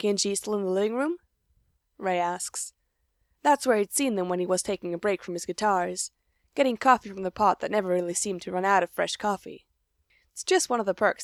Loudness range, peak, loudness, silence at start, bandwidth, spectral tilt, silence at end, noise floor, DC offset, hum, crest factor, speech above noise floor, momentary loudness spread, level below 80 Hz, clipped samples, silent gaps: 3 LU; -6 dBFS; -27 LUFS; 0 s; 16 kHz; -3.5 dB/octave; 0 s; -74 dBFS; under 0.1%; none; 20 dB; 48 dB; 11 LU; -66 dBFS; under 0.1%; none